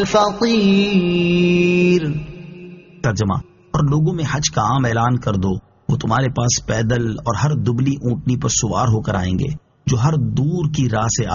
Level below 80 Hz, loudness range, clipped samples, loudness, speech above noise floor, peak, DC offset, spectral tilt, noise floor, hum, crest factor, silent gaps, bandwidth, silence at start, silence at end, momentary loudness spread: -40 dBFS; 2 LU; under 0.1%; -18 LUFS; 21 dB; -2 dBFS; under 0.1%; -6 dB/octave; -38 dBFS; none; 16 dB; none; 7.4 kHz; 0 s; 0 s; 9 LU